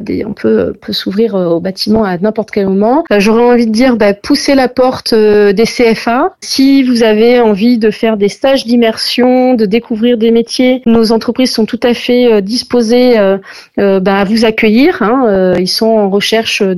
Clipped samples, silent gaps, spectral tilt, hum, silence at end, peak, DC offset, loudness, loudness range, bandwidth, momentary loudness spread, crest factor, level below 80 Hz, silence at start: under 0.1%; none; -5 dB/octave; none; 0 s; 0 dBFS; under 0.1%; -9 LUFS; 1 LU; 14 kHz; 5 LU; 8 dB; -42 dBFS; 0 s